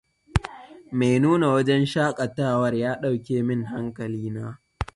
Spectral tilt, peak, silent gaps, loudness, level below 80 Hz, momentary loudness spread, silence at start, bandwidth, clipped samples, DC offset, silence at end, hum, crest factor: -7 dB/octave; 0 dBFS; none; -24 LUFS; -44 dBFS; 12 LU; 0.35 s; 11.5 kHz; under 0.1%; under 0.1%; 0.1 s; none; 22 dB